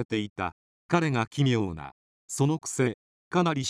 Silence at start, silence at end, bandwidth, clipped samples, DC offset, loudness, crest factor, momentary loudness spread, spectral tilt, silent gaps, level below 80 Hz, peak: 0 s; 0 s; 13 kHz; under 0.1%; under 0.1%; -28 LUFS; 18 dB; 12 LU; -5.5 dB/octave; 0.05-0.09 s, 0.30-0.36 s, 0.52-0.89 s, 1.27-1.31 s, 1.92-2.28 s, 2.94-3.31 s; -62 dBFS; -10 dBFS